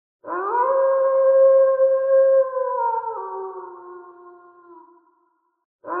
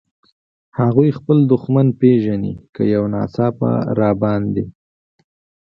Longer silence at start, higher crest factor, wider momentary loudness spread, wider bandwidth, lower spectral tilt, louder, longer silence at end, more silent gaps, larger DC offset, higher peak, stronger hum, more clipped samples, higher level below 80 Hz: second, 0.25 s vs 0.75 s; second, 12 dB vs 18 dB; first, 18 LU vs 9 LU; second, 2.2 kHz vs 5.6 kHz; second, -4.5 dB/octave vs -11.5 dB/octave; about the same, -18 LUFS vs -17 LUFS; second, 0 s vs 0.95 s; first, 5.65-5.79 s vs 2.69-2.73 s; neither; second, -8 dBFS vs 0 dBFS; neither; neither; second, -80 dBFS vs -48 dBFS